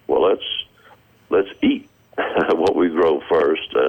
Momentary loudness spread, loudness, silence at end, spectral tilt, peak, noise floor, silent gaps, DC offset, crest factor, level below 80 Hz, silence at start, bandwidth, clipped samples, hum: 10 LU; -19 LUFS; 0 s; -6 dB/octave; -10 dBFS; -51 dBFS; none; under 0.1%; 10 dB; -54 dBFS; 0.1 s; 17 kHz; under 0.1%; none